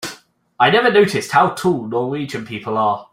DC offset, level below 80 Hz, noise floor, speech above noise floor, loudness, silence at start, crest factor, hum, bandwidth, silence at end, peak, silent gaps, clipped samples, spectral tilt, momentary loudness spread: under 0.1%; -58 dBFS; -43 dBFS; 26 dB; -17 LUFS; 0 s; 16 dB; none; 16 kHz; 0.1 s; -2 dBFS; none; under 0.1%; -5 dB/octave; 13 LU